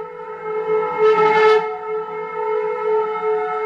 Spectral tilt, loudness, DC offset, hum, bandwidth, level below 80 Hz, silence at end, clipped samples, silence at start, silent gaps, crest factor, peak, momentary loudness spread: -5 dB/octave; -18 LUFS; under 0.1%; none; 7 kHz; -66 dBFS; 0 s; under 0.1%; 0 s; none; 16 dB; -2 dBFS; 13 LU